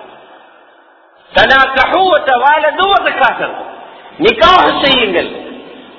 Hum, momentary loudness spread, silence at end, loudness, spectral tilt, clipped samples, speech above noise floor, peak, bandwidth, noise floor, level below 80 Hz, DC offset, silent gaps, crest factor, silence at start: none; 15 LU; 0.15 s; -10 LUFS; -4.5 dB/octave; 0.6%; 35 dB; 0 dBFS; 6 kHz; -45 dBFS; -40 dBFS; under 0.1%; none; 12 dB; 0 s